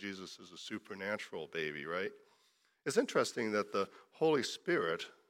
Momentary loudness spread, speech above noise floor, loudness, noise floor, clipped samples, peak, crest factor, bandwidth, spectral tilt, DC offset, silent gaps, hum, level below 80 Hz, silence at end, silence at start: 12 LU; 36 dB; -37 LUFS; -74 dBFS; under 0.1%; -18 dBFS; 20 dB; 16.5 kHz; -4 dB/octave; under 0.1%; none; none; -84 dBFS; 0.2 s; 0 s